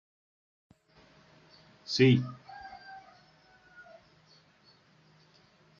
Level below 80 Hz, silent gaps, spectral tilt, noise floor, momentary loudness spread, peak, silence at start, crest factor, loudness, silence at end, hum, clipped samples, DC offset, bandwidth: -74 dBFS; none; -5.5 dB/octave; -63 dBFS; 30 LU; -12 dBFS; 1.9 s; 24 dB; -27 LUFS; 2.8 s; none; under 0.1%; under 0.1%; 7.4 kHz